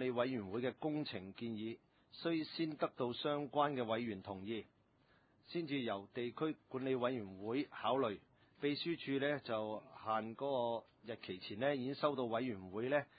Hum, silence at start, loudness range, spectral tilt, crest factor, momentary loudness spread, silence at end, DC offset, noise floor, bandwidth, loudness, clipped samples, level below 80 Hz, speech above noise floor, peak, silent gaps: none; 0 s; 2 LU; -4 dB/octave; 20 dB; 9 LU; 0.15 s; under 0.1%; -73 dBFS; 4.8 kHz; -41 LUFS; under 0.1%; -76 dBFS; 32 dB; -20 dBFS; none